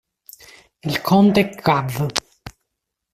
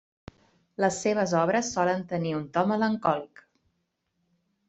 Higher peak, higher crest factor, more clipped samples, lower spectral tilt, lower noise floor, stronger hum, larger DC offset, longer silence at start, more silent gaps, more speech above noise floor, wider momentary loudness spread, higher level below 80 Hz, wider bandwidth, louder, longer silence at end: first, 0 dBFS vs -8 dBFS; about the same, 20 dB vs 20 dB; neither; about the same, -5.5 dB/octave vs -5 dB/octave; about the same, -79 dBFS vs -77 dBFS; neither; neither; about the same, 0.85 s vs 0.8 s; neither; first, 62 dB vs 51 dB; first, 11 LU vs 6 LU; first, -52 dBFS vs -66 dBFS; first, 15.5 kHz vs 8.2 kHz; first, -18 LUFS vs -27 LUFS; second, 0.65 s vs 1.4 s